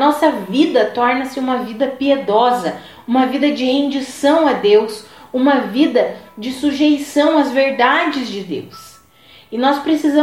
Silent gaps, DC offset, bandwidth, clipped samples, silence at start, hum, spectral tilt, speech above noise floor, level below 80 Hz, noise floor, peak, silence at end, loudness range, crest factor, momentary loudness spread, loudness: none; 0.1%; 15 kHz; under 0.1%; 0 s; none; -4.5 dB/octave; 31 dB; -58 dBFS; -46 dBFS; -2 dBFS; 0 s; 2 LU; 14 dB; 12 LU; -16 LUFS